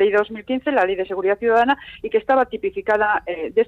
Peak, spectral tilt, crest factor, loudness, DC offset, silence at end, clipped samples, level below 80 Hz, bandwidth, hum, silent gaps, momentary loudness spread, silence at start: -6 dBFS; -6 dB/octave; 14 dB; -20 LUFS; under 0.1%; 0.05 s; under 0.1%; -54 dBFS; 7.4 kHz; none; none; 7 LU; 0 s